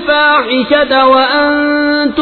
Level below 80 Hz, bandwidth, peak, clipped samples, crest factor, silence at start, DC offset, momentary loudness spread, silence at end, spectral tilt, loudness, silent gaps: -44 dBFS; 4.5 kHz; 0 dBFS; under 0.1%; 10 dB; 0 s; under 0.1%; 3 LU; 0 s; -6 dB/octave; -9 LUFS; none